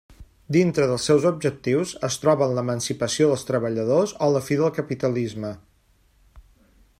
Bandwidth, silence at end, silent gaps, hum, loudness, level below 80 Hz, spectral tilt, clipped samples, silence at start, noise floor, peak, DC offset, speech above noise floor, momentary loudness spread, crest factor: 15.5 kHz; 0.6 s; none; none; -22 LUFS; -56 dBFS; -5.5 dB/octave; under 0.1%; 0.1 s; -61 dBFS; -6 dBFS; under 0.1%; 39 dB; 7 LU; 18 dB